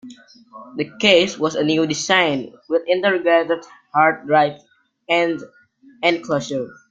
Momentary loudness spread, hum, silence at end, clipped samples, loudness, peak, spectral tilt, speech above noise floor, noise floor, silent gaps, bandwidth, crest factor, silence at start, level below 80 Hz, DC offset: 12 LU; none; 0.15 s; under 0.1%; -18 LUFS; 0 dBFS; -4 dB/octave; 24 dB; -43 dBFS; none; 9.2 kHz; 18 dB; 0.05 s; -64 dBFS; under 0.1%